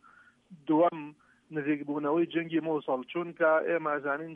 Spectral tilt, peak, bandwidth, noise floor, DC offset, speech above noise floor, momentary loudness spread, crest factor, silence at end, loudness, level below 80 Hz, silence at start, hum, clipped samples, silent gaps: -8.5 dB/octave; -14 dBFS; 3.7 kHz; -60 dBFS; under 0.1%; 31 dB; 12 LU; 16 dB; 0 s; -30 LUFS; -80 dBFS; 0.5 s; none; under 0.1%; none